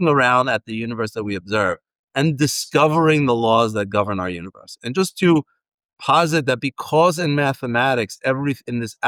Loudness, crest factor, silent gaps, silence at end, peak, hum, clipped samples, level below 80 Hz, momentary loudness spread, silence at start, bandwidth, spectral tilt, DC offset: -19 LUFS; 14 dB; 1.99-2.08 s, 5.74-5.78 s, 5.85-5.89 s; 0 s; -4 dBFS; none; under 0.1%; -60 dBFS; 11 LU; 0 s; 18 kHz; -5 dB/octave; under 0.1%